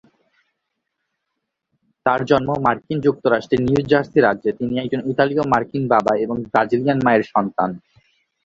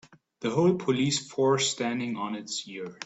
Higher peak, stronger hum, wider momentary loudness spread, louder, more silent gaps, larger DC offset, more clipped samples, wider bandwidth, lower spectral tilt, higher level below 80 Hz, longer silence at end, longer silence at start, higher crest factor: first, -2 dBFS vs -10 dBFS; neither; second, 6 LU vs 10 LU; first, -19 LUFS vs -27 LUFS; neither; neither; neither; second, 7.6 kHz vs 8.4 kHz; first, -7.5 dB/octave vs -4.5 dB/octave; first, -52 dBFS vs -68 dBFS; first, 0.65 s vs 0 s; first, 2.05 s vs 0.4 s; about the same, 18 dB vs 18 dB